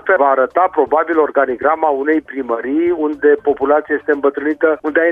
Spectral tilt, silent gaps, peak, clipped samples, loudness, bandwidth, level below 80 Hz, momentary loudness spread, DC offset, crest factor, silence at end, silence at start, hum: -7.5 dB/octave; none; -2 dBFS; under 0.1%; -15 LUFS; 3.7 kHz; -54 dBFS; 4 LU; under 0.1%; 12 dB; 0 s; 0.05 s; none